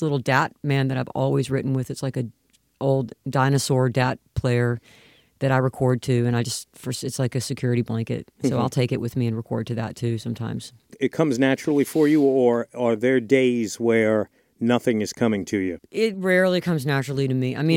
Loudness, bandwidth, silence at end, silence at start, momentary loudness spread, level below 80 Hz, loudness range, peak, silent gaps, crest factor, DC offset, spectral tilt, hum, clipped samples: -23 LUFS; 16.5 kHz; 0 s; 0 s; 9 LU; -56 dBFS; 5 LU; -4 dBFS; none; 18 dB; under 0.1%; -6.5 dB/octave; none; under 0.1%